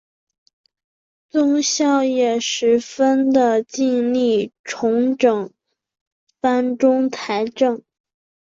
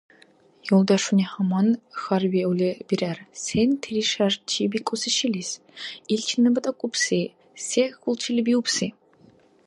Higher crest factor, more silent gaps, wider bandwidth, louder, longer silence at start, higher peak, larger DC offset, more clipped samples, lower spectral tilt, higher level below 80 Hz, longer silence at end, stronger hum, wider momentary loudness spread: about the same, 16 dB vs 18 dB; first, 4.59-4.64 s, 6.01-6.27 s vs none; second, 7.6 kHz vs 11.5 kHz; first, -18 LUFS vs -24 LUFS; first, 1.35 s vs 0.65 s; about the same, -4 dBFS vs -6 dBFS; neither; neither; about the same, -3.5 dB/octave vs -4.5 dB/octave; about the same, -66 dBFS vs -62 dBFS; about the same, 0.7 s vs 0.75 s; neither; second, 7 LU vs 10 LU